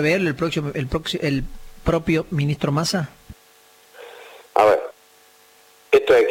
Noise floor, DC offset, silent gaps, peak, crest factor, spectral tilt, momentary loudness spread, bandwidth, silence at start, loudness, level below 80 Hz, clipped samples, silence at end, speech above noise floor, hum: -53 dBFS; under 0.1%; none; -4 dBFS; 18 dB; -5.5 dB/octave; 21 LU; 17 kHz; 0 s; -21 LUFS; -42 dBFS; under 0.1%; 0 s; 32 dB; none